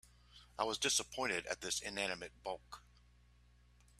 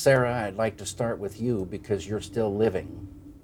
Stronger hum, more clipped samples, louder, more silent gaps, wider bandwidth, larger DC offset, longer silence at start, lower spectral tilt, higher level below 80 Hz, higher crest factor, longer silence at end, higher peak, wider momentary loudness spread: first, 60 Hz at -65 dBFS vs none; neither; second, -39 LUFS vs -28 LUFS; neither; second, 15 kHz vs 18 kHz; neither; about the same, 0.05 s vs 0 s; second, -1 dB/octave vs -5.5 dB/octave; second, -66 dBFS vs -52 dBFS; about the same, 22 dB vs 20 dB; first, 1.2 s vs 0.05 s; second, -20 dBFS vs -8 dBFS; first, 18 LU vs 10 LU